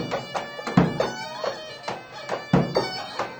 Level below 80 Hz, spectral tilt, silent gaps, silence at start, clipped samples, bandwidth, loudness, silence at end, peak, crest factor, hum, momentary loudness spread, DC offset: -50 dBFS; -6 dB/octave; none; 0 s; under 0.1%; over 20 kHz; -26 LUFS; 0 s; -4 dBFS; 24 dB; none; 12 LU; under 0.1%